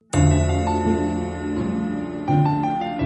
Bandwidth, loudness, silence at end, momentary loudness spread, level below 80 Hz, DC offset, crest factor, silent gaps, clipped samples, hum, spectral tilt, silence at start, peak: 8.8 kHz; -22 LUFS; 0 s; 8 LU; -34 dBFS; under 0.1%; 16 dB; none; under 0.1%; none; -7 dB/octave; 0.15 s; -6 dBFS